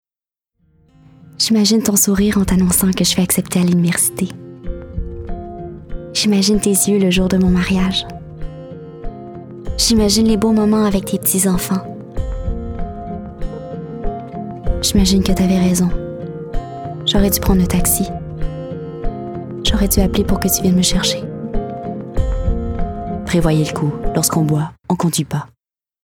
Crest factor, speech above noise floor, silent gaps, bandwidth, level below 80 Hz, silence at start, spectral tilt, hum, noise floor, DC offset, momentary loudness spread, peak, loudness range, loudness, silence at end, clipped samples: 16 dB; over 76 dB; none; 19 kHz; -26 dBFS; 1.2 s; -4.5 dB/octave; none; under -90 dBFS; under 0.1%; 16 LU; 0 dBFS; 4 LU; -16 LUFS; 0.6 s; under 0.1%